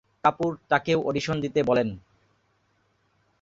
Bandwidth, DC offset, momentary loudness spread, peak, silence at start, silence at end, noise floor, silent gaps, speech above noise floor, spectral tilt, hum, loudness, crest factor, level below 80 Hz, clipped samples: 7.8 kHz; under 0.1%; 7 LU; -6 dBFS; 0.25 s; 1.4 s; -69 dBFS; none; 44 dB; -6 dB/octave; none; -25 LUFS; 22 dB; -58 dBFS; under 0.1%